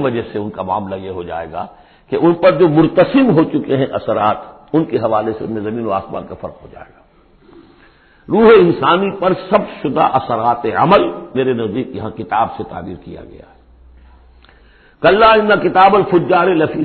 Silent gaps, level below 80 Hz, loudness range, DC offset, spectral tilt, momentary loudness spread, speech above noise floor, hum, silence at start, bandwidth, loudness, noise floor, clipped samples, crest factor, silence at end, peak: none; -46 dBFS; 9 LU; under 0.1%; -10.5 dB/octave; 17 LU; 34 dB; none; 0 s; 4.5 kHz; -14 LUFS; -48 dBFS; under 0.1%; 14 dB; 0 s; 0 dBFS